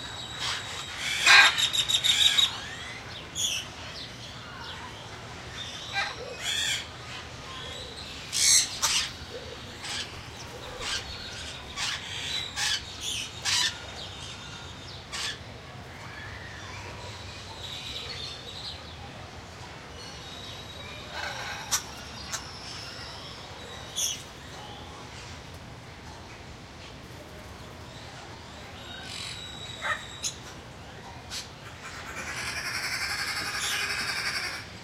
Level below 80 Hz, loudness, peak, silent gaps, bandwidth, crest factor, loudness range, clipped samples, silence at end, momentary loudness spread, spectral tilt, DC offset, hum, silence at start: -54 dBFS; -28 LUFS; -2 dBFS; none; 16 kHz; 30 dB; 13 LU; under 0.1%; 0 s; 19 LU; -0.5 dB/octave; under 0.1%; none; 0 s